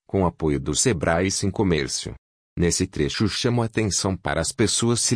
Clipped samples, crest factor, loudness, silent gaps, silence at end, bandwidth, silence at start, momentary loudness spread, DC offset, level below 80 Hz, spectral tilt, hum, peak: under 0.1%; 16 dB; -22 LUFS; 2.18-2.56 s; 0 s; 10.5 kHz; 0.15 s; 5 LU; under 0.1%; -42 dBFS; -4 dB/octave; none; -6 dBFS